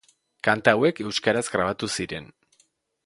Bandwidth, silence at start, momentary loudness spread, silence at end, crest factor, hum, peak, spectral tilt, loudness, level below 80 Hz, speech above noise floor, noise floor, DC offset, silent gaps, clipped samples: 11.5 kHz; 0.45 s; 10 LU; 0.8 s; 26 dB; none; 0 dBFS; -4 dB/octave; -24 LUFS; -58 dBFS; 43 dB; -66 dBFS; under 0.1%; none; under 0.1%